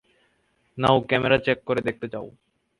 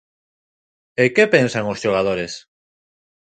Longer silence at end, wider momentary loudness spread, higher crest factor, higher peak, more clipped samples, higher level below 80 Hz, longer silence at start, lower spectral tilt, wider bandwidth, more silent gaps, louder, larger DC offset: second, 0.5 s vs 0.85 s; about the same, 18 LU vs 16 LU; about the same, 22 dB vs 20 dB; second, -4 dBFS vs 0 dBFS; neither; about the same, -54 dBFS vs -56 dBFS; second, 0.75 s vs 1 s; first, -7 dB/octave vs -5 dB/octave; first, 11.5 kHz vs 9.2 kHz; neither; second, -23 LUFS vs -18 LUFS; neither